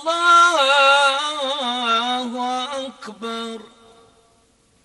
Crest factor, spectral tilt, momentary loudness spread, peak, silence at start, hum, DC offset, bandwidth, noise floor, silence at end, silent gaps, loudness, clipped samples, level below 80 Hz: 16 dB; -0.5 dB/octave; 18 LU; -4 dBFS; 0 s; none; under 0.1%; 11.5 kHz; -59 dBFS; 1.2 s; none; -17 LUFS; under 0.1%; -68 dBFS